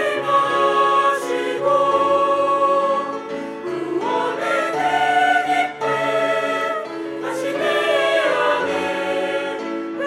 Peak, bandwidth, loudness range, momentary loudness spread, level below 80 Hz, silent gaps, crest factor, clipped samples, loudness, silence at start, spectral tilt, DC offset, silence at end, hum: -6 dBFS; 14 kHz; 2 LU; 10 LU; -68 dBFS; none; 14 dB; under 0.1%; -19 LUFS; 0 s; -3.5 dB/octave; under 0.1%; 0 s; none